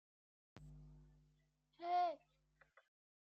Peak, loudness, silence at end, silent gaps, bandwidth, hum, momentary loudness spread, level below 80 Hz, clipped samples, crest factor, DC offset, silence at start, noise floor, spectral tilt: -30 dBFS; -42 LUFS; 1.05 s; none; 6.4 kHz; none; 24 LU; -72 dBFS; under 0.1%; 18 dB; under 0.1%; 0.55 s; -79 dBFS; -3.5 dB/octave